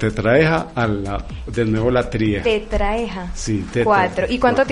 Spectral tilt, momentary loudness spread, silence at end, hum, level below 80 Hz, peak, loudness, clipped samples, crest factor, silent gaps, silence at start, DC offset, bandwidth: -6 dB/octave; 11 LU; 0 s; none; -30 dBFS; -2 dBFS; -19 LUFS; under 0.1%; 16 dB; none; 0 s; under 0.1%; 10.5 kHz